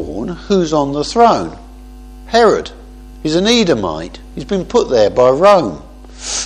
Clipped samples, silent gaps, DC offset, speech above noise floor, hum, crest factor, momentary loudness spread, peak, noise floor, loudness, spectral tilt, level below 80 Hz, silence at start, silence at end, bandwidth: under 0.1%; none; under 0.1%; 21 dB; 50 Hz at -35 dBFS; 14 dB; 17 LU; 0 dBFS; -34 dBFS; -13 LUFS; -4.5 dB/octave; -36 dBFS; 0 s; 0 s; 12 kHz